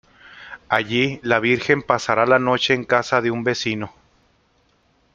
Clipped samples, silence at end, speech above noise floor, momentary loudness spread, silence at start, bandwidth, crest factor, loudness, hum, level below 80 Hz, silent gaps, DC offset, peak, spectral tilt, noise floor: under 0.1%; 1.25 s; 42 dB; 10 LU; 0.25 s; 7.6 kHz; 20 dB; -19 LUFS; none; -56 dBFS; none; under 0.1%; -2 dBFS; -5 dB/octave; -61 dBFS